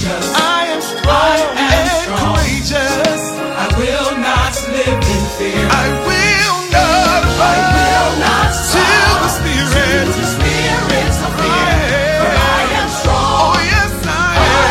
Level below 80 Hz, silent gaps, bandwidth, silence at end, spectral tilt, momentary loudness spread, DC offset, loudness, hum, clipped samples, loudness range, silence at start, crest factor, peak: -22 dBFS; none; 16.5 kHz; 0 s; -4 dB/octave; 5 LU; under 0.1%; -12 LUFS; none; under 0.1%; 3 LU; 0 s; 12 dB; 0 dBFS